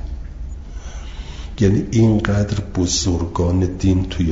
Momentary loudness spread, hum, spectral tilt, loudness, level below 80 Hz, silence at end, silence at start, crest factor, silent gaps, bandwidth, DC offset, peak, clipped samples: 18 LU; none; -6 dB/octave; -18 LUFS; -30 dBFS; 0 s; 0 s; 18 dB; none; 7.8 kHz; under 0.1%; -2 dBFS; under 0.1%